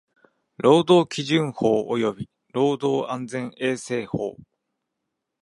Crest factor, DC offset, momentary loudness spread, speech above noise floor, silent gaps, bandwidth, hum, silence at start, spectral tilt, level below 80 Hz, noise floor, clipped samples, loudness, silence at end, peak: 20 dB; under 0.1%; 12 LU; 59 dB; none; 11.5 kHz; none; 0.6 s; -6 dB/octave; -62 dBFS; -81 dBFS; under 0.1%; -23 LUFS; 1.1 s; -4 dBFS